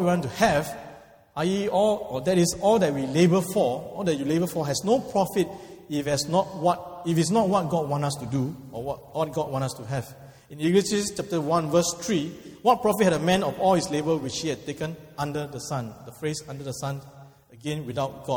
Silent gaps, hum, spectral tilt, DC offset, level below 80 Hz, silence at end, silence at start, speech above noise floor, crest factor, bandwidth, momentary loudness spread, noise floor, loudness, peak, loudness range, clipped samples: none; none; -5.5 dB/octave; under 0.1%; -56 dBFS; 0 s; 0 s; 23 dB; 20 dB; 19.5 kHz; 12 LU; -48 dBFS; -25 LUFS; -6 dBFS; 7 LU; under 0.1%